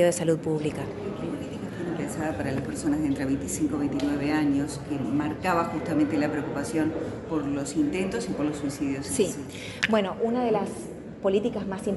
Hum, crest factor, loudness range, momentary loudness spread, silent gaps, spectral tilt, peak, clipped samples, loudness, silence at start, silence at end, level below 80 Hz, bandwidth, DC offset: none; 20 dB; 2 LU; 8 LU; none; -5.5 dB/octave; -6 dBFS; under 0.1%; -28 LUFS; 0 s; 0 s; -50 dBFS; 11.5 kHz; under 0.1%